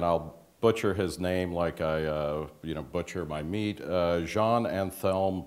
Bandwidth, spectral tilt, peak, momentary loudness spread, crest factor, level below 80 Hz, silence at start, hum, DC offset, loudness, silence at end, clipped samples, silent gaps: 16 kHz; -6.5 dB/octave; -10 dBFS; 8 LU; 20 dB; -52 dBFS; 0 s; none; under 0.1%; -30 LUFS; 0 s; under 0.1%; none